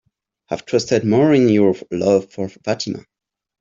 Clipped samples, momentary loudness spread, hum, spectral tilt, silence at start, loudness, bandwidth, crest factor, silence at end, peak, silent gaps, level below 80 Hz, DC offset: under 0.1%; 15 LU; none; -6 dB/octave; 0.5 s; -17 LUFS; 7.6 kHz; 16 dB; 0.6 s; -2 dBFS; none; -58 dBFS; under 0.1%